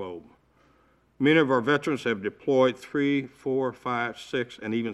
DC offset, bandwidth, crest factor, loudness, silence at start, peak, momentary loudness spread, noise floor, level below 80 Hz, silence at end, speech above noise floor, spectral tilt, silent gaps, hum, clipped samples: under 0.1%; 12 kHz; 18 dB; -26 LUFS; 0 s; -8 dBFS; 10 LU; -63 dBFS; -68 dBFS; 0 s; 38 dB; -6 dB/octave; none; none; under 0.1%